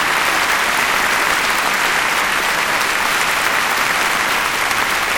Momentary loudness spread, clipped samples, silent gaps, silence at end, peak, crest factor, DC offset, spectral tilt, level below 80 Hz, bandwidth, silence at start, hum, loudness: 1 LU; under 0.1%; none; 0 s; 0 dBFS; 16 dB; under 0.1%; -0.5 dB/octave; -44 dBFS; 17.5 kHz; 0 s; none; -15 LUFS